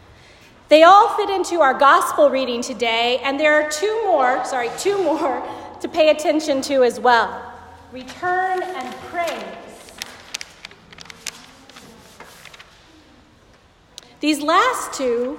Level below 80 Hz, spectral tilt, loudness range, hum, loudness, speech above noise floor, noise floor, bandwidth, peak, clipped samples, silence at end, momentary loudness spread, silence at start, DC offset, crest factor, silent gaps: -58 dBFS; -2.5 dB/octave; 20 LU; none; -17 LUFS; 34 dB; -52 dBFS; 16.5 kHz; 0 dBFS; under 0.1%; 0 s; 20 LU; 0.7 s; under 0.1%; 18 dB; none